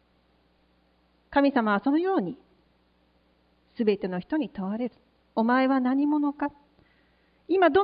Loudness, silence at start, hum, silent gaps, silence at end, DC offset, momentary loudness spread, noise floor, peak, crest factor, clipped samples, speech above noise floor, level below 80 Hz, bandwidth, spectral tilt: -26 LUFS; 1.3 s; none; none; 0 s; under 0.1%; 11 LU; -66 dBFS; -8 dBFS; 18 dB; under 0.1%; 41 dB; -64 dBFS; 5.2 kHz; -10 dB/octave